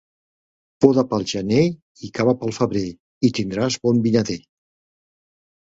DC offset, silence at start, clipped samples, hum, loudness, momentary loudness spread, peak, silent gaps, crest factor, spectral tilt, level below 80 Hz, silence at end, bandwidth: under 0.1%; 0.8 s; under 0.1%; none; -20 LUFS; 11 LU; 0 dBFS; 1.82-1.95 s, 3.00-3.21 s; 22 dB; -6 dB/octave; -54 dBFS; 1.4 s; 7.8 kHz